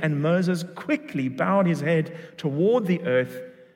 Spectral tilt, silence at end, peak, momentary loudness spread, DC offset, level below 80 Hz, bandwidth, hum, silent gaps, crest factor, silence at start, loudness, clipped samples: -7.5 dB/octave; 0.25 s; -8 dBFS; 9 LU; under 0.1%; -72 dBFS; 16 kHz; none; none; 14 dB; 0 s; -24 LUFS; under 0.1%